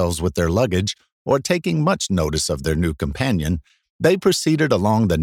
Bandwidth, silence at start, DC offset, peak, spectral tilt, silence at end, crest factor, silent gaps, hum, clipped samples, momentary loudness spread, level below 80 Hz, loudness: 17 kHz; 0 s; under 0.1%; -4 dBFS; -5.5 dB/octave; 0 s; 16 dB; 1.12-1.25 s, 3.90-3.99 s; none; under 0.1%; 6 LU; -36 dBFS; -20 LUFS